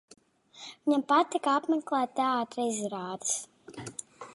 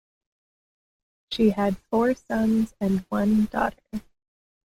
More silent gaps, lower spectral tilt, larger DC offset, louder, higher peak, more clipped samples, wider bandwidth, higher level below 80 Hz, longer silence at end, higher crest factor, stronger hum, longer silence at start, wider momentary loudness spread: neither; second, -3 dB/octave vs -7 dB/octave; neither; second, -29 LUFS vs -24 LUFS; about the same, -12 dBFS vs -10 dBFS; neither; second, 11.5 kHz vs 15 kHz; second, -78 dBFS vs -50 dBFS; second, 0 s vs 0.65 s; about the same, 18 dB vs 16 dB; neither; second, 0.55 s vs 1.3 s; first, 18 LU vs 13 LU